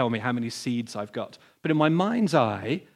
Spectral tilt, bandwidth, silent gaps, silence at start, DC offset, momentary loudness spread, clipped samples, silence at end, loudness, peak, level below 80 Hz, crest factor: -6 dB/octave; 13 kHz; none; 0 s; under 0.1%; 12 LU; under 0.1%; 0.15 s; -26 LUFS; -6 dBFS; -72 dBFS; 20 dB